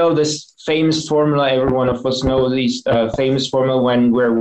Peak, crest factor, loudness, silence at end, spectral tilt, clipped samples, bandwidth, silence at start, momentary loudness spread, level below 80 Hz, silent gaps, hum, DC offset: -6 dBFS; 10 dB; -17 LUFS; 0 s; -5.5 dB/octave; under 0.1%; 8.8 kHz; 0 s; 4 LU; -40 dBFS; none; none; under 0.1%